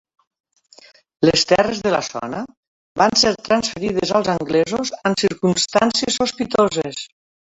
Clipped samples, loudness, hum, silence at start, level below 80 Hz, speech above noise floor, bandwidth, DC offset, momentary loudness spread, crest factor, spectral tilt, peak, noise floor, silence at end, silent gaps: under 0.1%; -18 LUFS; none; 1.2 s; -52 dBFS; 31 dB; 8.2 kHz; under 0.1%; 12 LU; 18 dB; -3.5 dB/octave; -2 dBFS; -49 dBFS; 0.35 s; 2.57-2.95 s